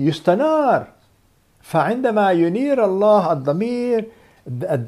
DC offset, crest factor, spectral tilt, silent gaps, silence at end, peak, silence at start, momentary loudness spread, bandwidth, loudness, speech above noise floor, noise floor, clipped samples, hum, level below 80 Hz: under 0.1%; 16 dB; -7.5 dB/octave; none; 0 s; -2 dBFS; 0 s; 8 LU; 13.5 kHz; -18 LUFS; 40 dB; -57 dBFS; under 0.1%; none; -62 dBFS